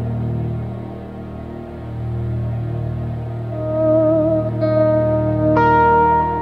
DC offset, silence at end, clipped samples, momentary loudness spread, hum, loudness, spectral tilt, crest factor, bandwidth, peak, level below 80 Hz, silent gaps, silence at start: under 0.1%; 0 s; under 0.1%; 18 LU; none; -18 LUFS; -10.5 dB/octave; 14 dB; 5.4 kHz; -4 dBFS; -36 dBFS; none; 0 s